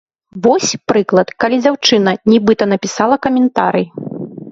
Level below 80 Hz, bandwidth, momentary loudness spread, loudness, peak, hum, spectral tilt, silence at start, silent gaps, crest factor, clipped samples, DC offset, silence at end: -54 dBFS; 7.8 kHz; 7 LU; -13 LUFS; 0 dBFS; none; -4.5 dB/octave; 0.35 s; none; 14 dB; under 0.1%; under 0.1%; 0 s